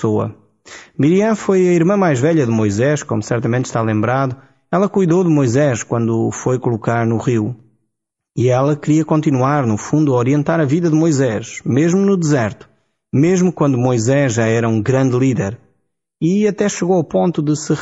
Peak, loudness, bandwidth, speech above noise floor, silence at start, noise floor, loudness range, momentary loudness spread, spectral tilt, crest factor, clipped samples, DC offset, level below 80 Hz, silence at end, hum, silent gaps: -4 dBFS; -16 LUFS; 8 kHz; 62 dB; 0 s; -77 dBFS; 2 LU; 6 LU; -7 dB/octave; 12 dB; under 0.1%; under 0.1%; -54 dBFS; 0 s; none; none